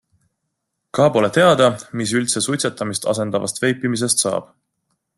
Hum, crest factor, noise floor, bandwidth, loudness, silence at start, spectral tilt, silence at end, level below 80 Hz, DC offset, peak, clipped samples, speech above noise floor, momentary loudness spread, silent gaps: none; 18 dB; -76 dBFS; 12.5 kHz; -18 LUFS; 0.95 s; -4 dB/octave; 0.75 s; -58 dBFS; under 0.1%; -2 dBFS; under 0.1%; 58 dB; 8 LU; none